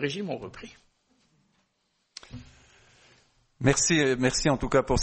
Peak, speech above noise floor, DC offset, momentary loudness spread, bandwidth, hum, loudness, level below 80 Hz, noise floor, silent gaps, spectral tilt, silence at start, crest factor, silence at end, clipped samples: -8 dBFS; 49 dB; under 0.1%; 25 LU; 8.8 kHz; none; -25 LUFS; -44 dBFS; -74 dBFS; none; -4 dB/octave; 0 s; 22 dB; 0 s; under 0.1%